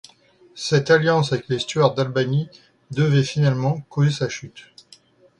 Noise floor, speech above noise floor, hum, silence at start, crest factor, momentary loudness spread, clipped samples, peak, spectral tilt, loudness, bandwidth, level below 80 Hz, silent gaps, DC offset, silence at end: -54 dBFS; 34 dB; none; 0.55 s; 18 dB; 13 LU; under 0.1%; -4 dBFS; -6 dB/octave; -20 LUFS; 10.5 kHz; -58 dBFS; none; under 0.1%; 0.8 s